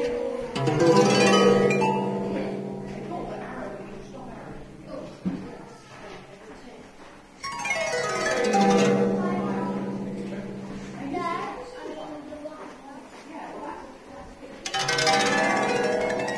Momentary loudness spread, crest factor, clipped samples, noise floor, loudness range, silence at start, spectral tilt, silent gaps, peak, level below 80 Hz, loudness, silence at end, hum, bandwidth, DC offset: 23 LU; 22 dB; under 0.1%; -47 dBFS; 16 LU; 0 s; -4.5 dB/octave; none; -6 dBFS; -54 dBFS; -24 LUFS; 0 s; none; 11 kHz; under 0.1%